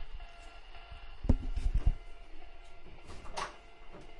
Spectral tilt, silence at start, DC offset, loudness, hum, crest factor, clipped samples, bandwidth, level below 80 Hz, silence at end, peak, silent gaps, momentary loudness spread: -6 dB/octave; 0 s; under 0.1%; -38 LUFS; none; 24 dB; under 0.1%; 11 kHz; -38 dBFS; 0 s; -12 dBFS; none; 21 LU